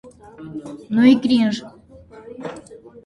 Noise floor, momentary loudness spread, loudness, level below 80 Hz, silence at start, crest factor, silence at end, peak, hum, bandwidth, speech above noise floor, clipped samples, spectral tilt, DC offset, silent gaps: -44 dBFS; 25 LU; -17 LUFS; -56 dBFS; 0.4 s; 18 dB; 0.3 s; -2 dBFS; none; 10.5 kHz; 27 dB; under 0.1%; -6 dB/octave; under 0.1%; none